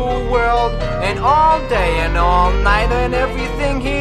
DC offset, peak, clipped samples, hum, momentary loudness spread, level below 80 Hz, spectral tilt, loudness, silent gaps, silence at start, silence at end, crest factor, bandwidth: under 0.1%; -2 dBFS; under 0.1%; none; 6 LU; -20 dBFS; -6 dB/octave; -16 LUFS; none; 0 s; 0 s; 14 dB; 11.5 kHz